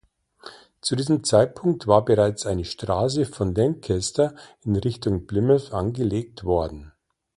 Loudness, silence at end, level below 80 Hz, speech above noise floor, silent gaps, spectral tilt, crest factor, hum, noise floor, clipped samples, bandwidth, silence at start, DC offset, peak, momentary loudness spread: -23 LUFS; 0.5 s; -44 dBFS; 25 dB; none; -6 dB/octave; 20 dB; none; -47 dBFS; under 0.1%; 11.5 kHz; 0.45 s; under 0.1%; -2 dBFS; 9 LU